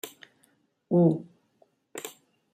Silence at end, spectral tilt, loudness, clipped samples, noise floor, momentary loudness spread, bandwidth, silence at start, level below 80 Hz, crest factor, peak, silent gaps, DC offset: 0.45 s; -7.5 dB/octave; -25 LUFS; under 0.1%; -68 dBFS; 21 LU; 15.5 kHz; 0.05 s; -76 dBFS; 20 dB; -10 dBFS; none; under 0.1%